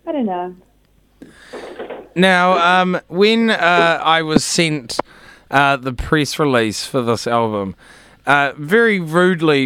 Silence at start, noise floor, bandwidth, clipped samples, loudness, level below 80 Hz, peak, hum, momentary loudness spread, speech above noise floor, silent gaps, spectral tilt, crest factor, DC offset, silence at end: 0.05 s; -55 dBFS; 16.5 kHz; under 0.1%; -15 LUFS; -44 dBFS; 0 dBFS; none; 14 LU; 39 dB; none; -4.5 dB/octave; 16 dB; under 0.1%; 0 s